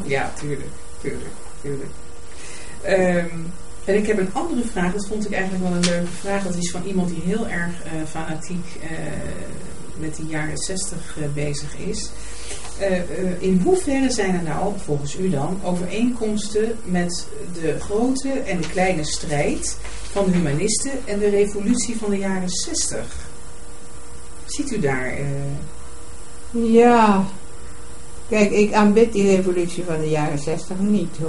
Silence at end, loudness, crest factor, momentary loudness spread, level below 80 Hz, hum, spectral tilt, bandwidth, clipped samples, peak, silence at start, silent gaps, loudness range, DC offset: 0 s; -22 LUFS; 20 dB; 19 LU; -40 dBFS; none; -5 dB/octave; 11.5 kHz; under 0.1%; -2 dBFS; 0 s; none; 9 LU; 5%